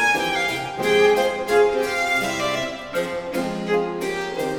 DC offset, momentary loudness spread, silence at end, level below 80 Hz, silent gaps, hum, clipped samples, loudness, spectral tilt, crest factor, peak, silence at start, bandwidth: under 0.1%; 8 LU; 0 s; -52 dBFS; none; none; under 0.1%; -21 LUFS; -3.5 dB/octave; 16 dB; -6 dBFS; 0 s; 18 kHz